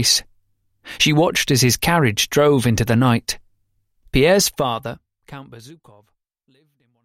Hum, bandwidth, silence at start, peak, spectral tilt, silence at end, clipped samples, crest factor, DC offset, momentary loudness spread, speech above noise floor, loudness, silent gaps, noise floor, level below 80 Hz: none; 16.5 kHz; 0 s; -2 dBFS; -4 dB/octave; 1.3 s; under 0.1%; 18 dB; under 0.1%; 17 LU; 49 dB; -17 LUFS; none; -66 dBFS; -42 dBFS